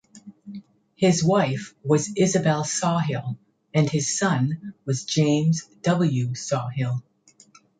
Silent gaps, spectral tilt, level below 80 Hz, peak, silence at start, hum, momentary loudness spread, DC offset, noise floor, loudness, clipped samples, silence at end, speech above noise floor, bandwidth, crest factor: none; -5.5 dB/octave; -62 dBFS; -6 dBFS; 0.15 s; none; 12 LU; under 0.1%; -55 dBFS; -23 LUFS; under 0.1%; 0.8 s; 33 dB; 9.4 kHz; 16 dB